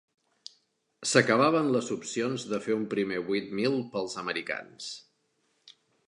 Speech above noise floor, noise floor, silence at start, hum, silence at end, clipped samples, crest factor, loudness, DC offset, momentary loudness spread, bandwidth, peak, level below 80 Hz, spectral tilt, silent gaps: 45 dB; -74 dBFS; 1 s; none; 1.1 s; under 0.1%; 24 dB; -28 LUFS; under 0.1%; 19 LU; 11.5 kHz; -6 dBFS; -74 dBFS; -4 dB/octave; none